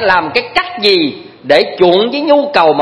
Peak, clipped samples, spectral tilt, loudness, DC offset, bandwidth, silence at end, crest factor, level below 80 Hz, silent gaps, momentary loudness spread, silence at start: 0 dBFS; 0.3%; -5 dB/octave; -11 LUFS; under 0.1%; 11 kHz; 0 s; 12 dB; -48 dBFS; none; 6 LU; 0 s